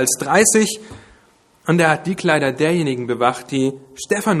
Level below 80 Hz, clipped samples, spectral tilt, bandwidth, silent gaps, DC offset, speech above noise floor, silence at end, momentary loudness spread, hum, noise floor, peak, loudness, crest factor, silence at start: -56 dBFS; under 0.1%; -4 dB/octave; 14.5 kHz; none; under 0.1%; 37 dB; 0 s; 9 LU; none; -54 dBFS; 0 dBFS; -17 LUFS; 18 dB; 0 s